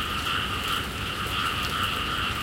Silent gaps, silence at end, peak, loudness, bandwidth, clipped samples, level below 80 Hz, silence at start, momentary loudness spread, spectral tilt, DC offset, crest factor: none; 0 s; -14 dBFS; -27 LUFS; 17 kHz; under 0.1%; -40 dBFS; 0 s; 2 LU; -3 dB/octave; under 0.1%; 14 dB